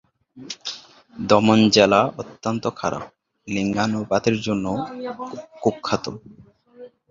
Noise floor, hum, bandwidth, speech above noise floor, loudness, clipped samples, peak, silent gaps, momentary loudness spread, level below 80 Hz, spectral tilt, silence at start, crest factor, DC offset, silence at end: -45 dBFS; none; 7.6 kHz; 24 dB; -21 LUFS; under 0.1%; -2 dBFS; none; 19 LU; -54 dBFS; -5 dB/octave; 0.35 s; 22 dB; under 0.1%; 0.25 s